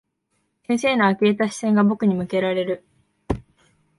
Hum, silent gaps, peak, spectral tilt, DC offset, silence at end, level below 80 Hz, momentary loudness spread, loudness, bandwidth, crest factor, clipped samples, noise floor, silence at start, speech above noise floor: none; none; -6 dBFS; -6 dB/octave; under 0.1%; 0.55 s; -48 dBFS; 12 LU; -21 LUFS; 11.5 kHz; 16 dB; under 0.1%; -72 dBFS; 0.7 s; 52 dB